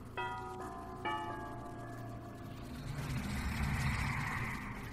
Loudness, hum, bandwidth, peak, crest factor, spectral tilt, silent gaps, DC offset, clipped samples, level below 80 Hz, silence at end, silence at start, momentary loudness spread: -40 LUFS; none; 16 kHz; -22 dBFS; 18 dB; -5.5 dB/octave; none; under 0.1%; under 0.1%; -48 dBFS; 0 s; 0 s; 11 LU